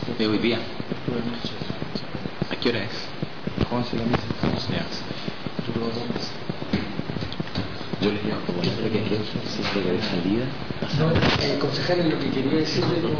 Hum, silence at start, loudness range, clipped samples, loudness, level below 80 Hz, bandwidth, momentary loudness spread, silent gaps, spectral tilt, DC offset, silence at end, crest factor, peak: none; 0 s; 5 LU; under 0.1%; -26 LUFS; -46 dBFS; 5.4 kHz; 9 LU; none; -6.5 dB/octave; 2%; 0 s; 14 dB; -10 dBFS